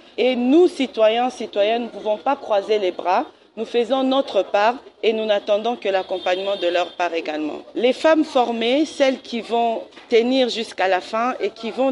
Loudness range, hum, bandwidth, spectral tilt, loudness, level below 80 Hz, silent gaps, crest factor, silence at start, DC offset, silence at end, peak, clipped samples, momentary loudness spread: 2 LU; none; 11.5 kHz; -4 dB/octave; -20 LUFS; -68 dBFS; none; 16 dB; 0.2 s; under 0.1%; 0 s; -4 dBFS; under 0.1%; 7 LU